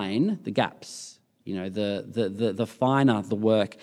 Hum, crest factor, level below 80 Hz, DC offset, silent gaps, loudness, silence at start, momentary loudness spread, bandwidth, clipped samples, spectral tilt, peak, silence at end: none; 20 dB; -76 dBFS; under 0.1%; none; -26 LUFS; 0 s; 17 LU; 12.5 kHz; under 0.1%; -6.5 dB/octave; -6 dBFS; 0.1 s